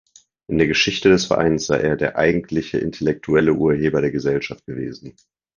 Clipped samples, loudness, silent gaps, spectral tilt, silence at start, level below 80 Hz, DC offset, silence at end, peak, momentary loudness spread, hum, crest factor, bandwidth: under 0.1%; -19 LUFS; none; -5 dB/octave; 0.5 s; -44 dBFS; under 0.1%; 0.45 s; 0 dBFS; 13 LU; none; 18 dB; 7.4 kHz